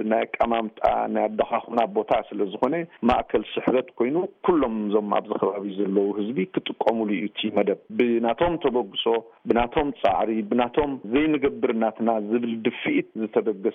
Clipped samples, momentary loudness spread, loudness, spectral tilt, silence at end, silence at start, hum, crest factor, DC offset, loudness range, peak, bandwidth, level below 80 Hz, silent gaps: under 0.1%; 4 LU; -24 LUFS; -4 dB/octave; 0 s; 0 s; none; 16 dB; under 0.1%; 1 LU; -8 dBFS; 5.8 kHz; -50 dBFS; none